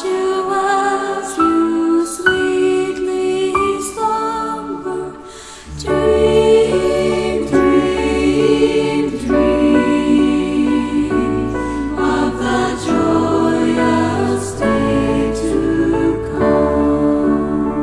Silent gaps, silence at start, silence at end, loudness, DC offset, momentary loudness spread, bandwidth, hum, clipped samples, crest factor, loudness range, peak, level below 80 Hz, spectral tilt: none; 0 s; 0 s; -15 LUFS; under 0.1%; 7 LU; 12 kHz; none; under 0.1%; 14 dB; 3 LU; 0 dBFS; -34 dBFS; -5.5 dB/octave